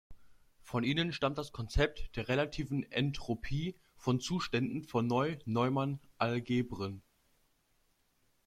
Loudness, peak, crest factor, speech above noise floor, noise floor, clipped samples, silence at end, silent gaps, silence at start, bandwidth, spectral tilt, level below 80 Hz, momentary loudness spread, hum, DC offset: -35 LUFS; -14 dBFS; 20 dB; 40 dB; -74 dBFS; under 0.1%; 1.45 s; none; 0.1 s; 14.5 kHz; -6 dB/octave; -50 dBFS; 8 LU; none; under 0.1%